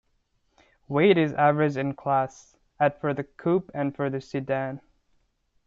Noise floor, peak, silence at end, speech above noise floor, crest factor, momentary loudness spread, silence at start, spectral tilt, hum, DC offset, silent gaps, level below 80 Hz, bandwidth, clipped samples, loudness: -70 dBFS; -8 dBFS; 0.9 s; 46 dB; 18 dB; 10 LU; 0.9 s; -7.5 dB/octave; none; under 0.1%; none; -64 dBFS; 7.6 kHz; under 0.1%; -25 LUFS